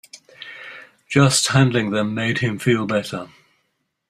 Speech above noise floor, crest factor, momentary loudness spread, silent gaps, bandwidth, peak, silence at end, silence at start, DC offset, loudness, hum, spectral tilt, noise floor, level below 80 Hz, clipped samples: 53 dB; 20 dB; 22 LU; none; 14.5 kHz; -2 dBFS; 0.8 s; 0.15 s; under 0.1%; -19 LUFS; none; -4.5 dB/octave; -71 dBFS; -56 dBFS; under 0.1%